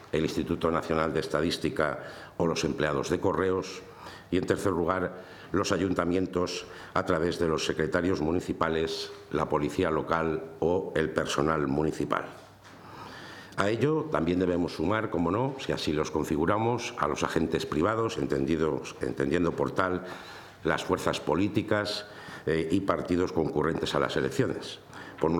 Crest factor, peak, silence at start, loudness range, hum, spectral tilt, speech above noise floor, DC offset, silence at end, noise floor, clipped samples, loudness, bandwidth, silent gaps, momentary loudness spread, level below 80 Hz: 20 dB; -10 dBFS; 0 s; 2 LU; none; -5.5 dB/octave; 21 dB; under 0.1%; 0 s; -49 dBFS; under 0.1%; -29 LUFS; 18.5 kHz; none; 9 LU; -54 dBFS